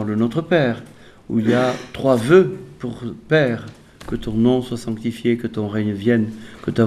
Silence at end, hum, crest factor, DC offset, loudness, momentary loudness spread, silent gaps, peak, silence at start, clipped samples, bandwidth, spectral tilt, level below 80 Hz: 0 s; none; 18 dB; under 0.1%; -20 LUFS; 15 LU; none; 0 dBFS; 0 s; under 0.1%; 13.5 kHz; -7 dB/octave; -48 dBFS